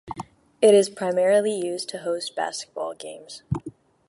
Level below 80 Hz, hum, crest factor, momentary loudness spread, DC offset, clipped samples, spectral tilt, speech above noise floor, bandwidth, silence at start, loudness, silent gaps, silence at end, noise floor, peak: -56 dBFS; none; 18 dB; 21 LU; under 0.1%; under 0.1%; -4.5 dB/octave; 21 dB; 11.5 kHz; 0.05 s; -23 LUFS; none; 0.4 s; -43 dBFS; -6 dBFS